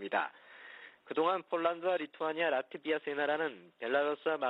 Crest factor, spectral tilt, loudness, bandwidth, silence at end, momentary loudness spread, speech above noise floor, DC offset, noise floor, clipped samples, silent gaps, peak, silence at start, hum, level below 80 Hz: 18 dB; -6.5 dB/octave; -34 LUFS; 5.2 kHz; 0 s; 18 LU; 20 dB; under 0.1%; -54 dBFS; under 0.1%; none; -18 dBFS; 0 s; none; -84 dBFS